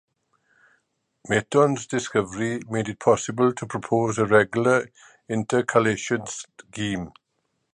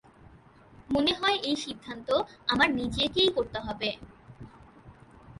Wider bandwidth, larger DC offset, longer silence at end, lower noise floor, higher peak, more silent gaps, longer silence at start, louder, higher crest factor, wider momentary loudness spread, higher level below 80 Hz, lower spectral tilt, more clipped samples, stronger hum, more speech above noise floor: about the same, 10.5 kHz vs 11.5 kHz; neither; first, 0.65 s vs 0.05 s; first, -74 dBFS vs -55 dBFS; first, -2 dBFS vs -10 dBFS; neither; first, 1.25 s vs 0.3 s; first, -23 LUFS vs -28 LUFS; about the same, 22 dB vs 20 dB; about the same, 12 LU vs 10 LU; second, -58 dBFS vs -52 dBFS; about the same, -5 dB/octave vs -4 dB/octave; neither; neither; first, 51 dB vs 27 dB